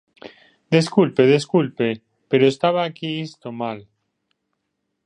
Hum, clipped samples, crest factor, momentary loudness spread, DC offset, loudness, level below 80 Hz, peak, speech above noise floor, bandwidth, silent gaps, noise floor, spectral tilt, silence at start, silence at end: none; under 0.1%; 20 dB; 13 LU; under 0.1%; -20 LUFS; -66 dBFS; -2 dBFS; 57 dB; 10.5 kHz; none; -76 dBFS; -6.5 dB/octave; 0.25 s; 1.25 s